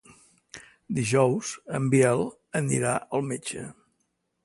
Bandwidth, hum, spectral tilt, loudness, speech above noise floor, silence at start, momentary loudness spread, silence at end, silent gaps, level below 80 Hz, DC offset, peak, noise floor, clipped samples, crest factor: 11.5 kHz; none; -5.5 dB/octave; -26 LUFS; 50 dB; 0.55 s; 23 LU; 0.75 s; none; -62 dBFS; under 0.1%; -8 dBFS; -76 dBFS; under 0.1%; 20 dB